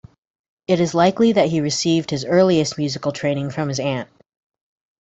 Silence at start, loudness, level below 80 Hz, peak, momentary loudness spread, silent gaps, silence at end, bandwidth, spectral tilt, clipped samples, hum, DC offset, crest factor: 0.7 s; -19 LUFS; -58 dBFS; -2 dBFS; 8 LU; none; 0.95 s; 8.4 kHz; -5.5 dB/octave; under 0.1%; none; under 0.1%; 18 dB